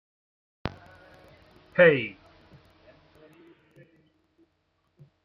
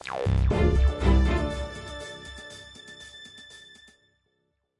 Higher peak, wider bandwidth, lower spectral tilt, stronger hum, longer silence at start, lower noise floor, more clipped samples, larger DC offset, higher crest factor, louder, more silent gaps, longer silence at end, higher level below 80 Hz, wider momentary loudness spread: first, -6 dBFS vs -10 dBFS; second, 5.8 kHz vs 11 kHz; about the same, -8 dB/octave vs -7 dB/octave; neither; first, 0.65 s vs 0.05 s; about the same, -73 dBFS vs -75 dBFS; neither; neither; first, 26 dB vs 16 dB; about the same, -24 LUFS vs -26 LUFS; neither; first, 3.1 s vs 1.2 s; second, -62 dBFS vs -30 dBFS; about the same, 20 LU vs 21 LU